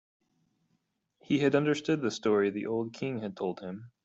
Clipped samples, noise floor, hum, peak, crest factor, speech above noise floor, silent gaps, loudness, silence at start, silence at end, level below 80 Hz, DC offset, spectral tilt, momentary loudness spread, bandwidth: under 0.1%; -77 dBFS; none; -12 dBFS; 18 dB; 47 dB; none; -30 LUFS; 1.3 s; 0.15 s; -72 dBFS; under 0.1%; -6 dB/octave; 9 LU; 8 kHz